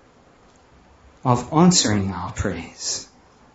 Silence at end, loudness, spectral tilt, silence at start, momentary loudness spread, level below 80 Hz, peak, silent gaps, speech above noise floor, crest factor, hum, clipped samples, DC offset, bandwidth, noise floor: 0.5 s; -21 LUFS; -4.5 dB/octave; 1.25 s; 13 LU; -44 dBFS; -2 dBFS; none; 33 dB; 20 dB; none; under 0.1%; under 0.1%; 8 kHz; -53 dBFS